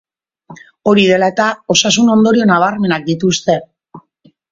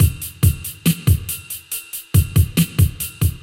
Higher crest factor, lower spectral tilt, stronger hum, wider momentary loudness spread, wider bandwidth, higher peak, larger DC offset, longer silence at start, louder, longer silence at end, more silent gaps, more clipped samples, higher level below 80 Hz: about the same, 14 dB vs 16 dB; about the same, -4 dB/octave vs -5 dB/octave; neither; second, 6 LU vs 10 LU; second, 7.8 kHz vs 17 kHz; about the same, 0 dBFS vs -2 dBFS; neither; first, 0.5 s vs 0 s; first, -12 LUFS vs -19 LUFS; first, 0.5 s vs 0.05 s; neither; neither; second, -54 dBFS vs -28 dBFS